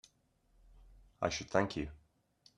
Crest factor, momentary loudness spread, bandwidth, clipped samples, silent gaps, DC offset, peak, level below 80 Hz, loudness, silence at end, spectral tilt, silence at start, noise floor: 26 dB; 9 LU; 11.5 kHz; under 0.1%; none; under 0.1%; -14 dBFS; -60 dBFS; -37 LUFS; 0.6 s; -4.5 dB/octave; 1.2 s; -73 dBFS